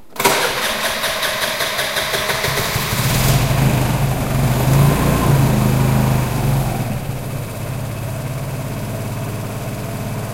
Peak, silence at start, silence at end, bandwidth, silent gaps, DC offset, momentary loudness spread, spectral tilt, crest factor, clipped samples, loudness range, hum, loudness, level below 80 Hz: 0 dBFS; 0 s; 0 s; 16 kHz; none; under 0.1%; 10 LU; -4.5 dB/octave; 18 dB; under 0.1%; 8 LU; none; -18 LUFS; -30 dBFS